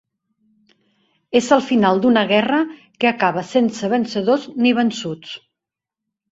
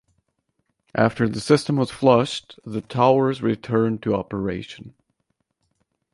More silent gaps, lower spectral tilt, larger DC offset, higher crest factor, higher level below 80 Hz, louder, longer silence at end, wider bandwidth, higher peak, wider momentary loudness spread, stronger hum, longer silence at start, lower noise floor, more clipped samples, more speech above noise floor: neither; second, -5 dB/octave vs -6.5 dB/octave; neither; about the same, 18 dB vs 20 dB; second, -62 dBFS vs -54 dBFS; first, -18 LUFS vs -21 LUFS; second, 0.95 s vs 1.25 s; second, 8 kHz vs 11.5 kHz; about the same, -2 dBFS vs -2 dBFS; about the same, 12 LU vs 14 LU; neither; first, 1.3 s vs 0.95 s; first, -85 dBFS vs -74 dBFS; neither; first, 68 dB vs 53 dB